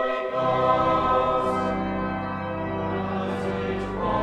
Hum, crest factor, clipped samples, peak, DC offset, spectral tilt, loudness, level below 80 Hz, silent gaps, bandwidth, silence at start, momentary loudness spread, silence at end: none; 16 dB; under 0.1%; -8 dBFS; under 0.1%; -7.5 dB/octave; -25 LUFS; -44 dBFS; none; 10.5 kHz; 0 s; 8 LU; 0 s